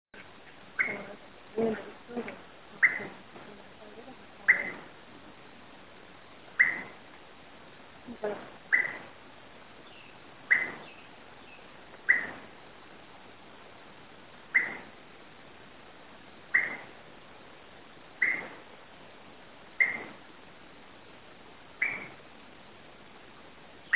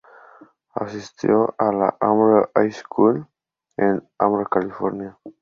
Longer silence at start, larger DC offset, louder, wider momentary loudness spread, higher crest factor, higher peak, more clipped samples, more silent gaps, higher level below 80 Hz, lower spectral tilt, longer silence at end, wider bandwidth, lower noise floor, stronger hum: second, 0.15 s vs 0.75 s; first, 0.2% vs under 0.1%; second, -29 LUFS vs -20 LUFS; first, 25 LU vs 14 LU; first, 26 dB vs 18 dB; second, -10 dBFS vs -2 dBFS; neither; neither; second, -70 dBFS vs -62 dBFS; second, -1.5 dB/octave vs -8 dB/octave; about the same, 0 s vs 0.1 s; second, 4 kHz vs 7.2 kHz; about the same, -53 dBFS vs -50 dBFS; neither